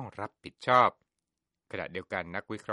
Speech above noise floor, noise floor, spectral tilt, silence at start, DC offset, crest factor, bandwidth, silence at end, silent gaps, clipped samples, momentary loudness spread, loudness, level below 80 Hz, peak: 57 dB; -87 dBFS; -5.5 dB/octave; 0 s; under 0.1%; 24 dB; 11.5 kHz; 0 s; none; under 0.1%; 17 LU; -29 LUFS; -68 dBFS; -8 dBFS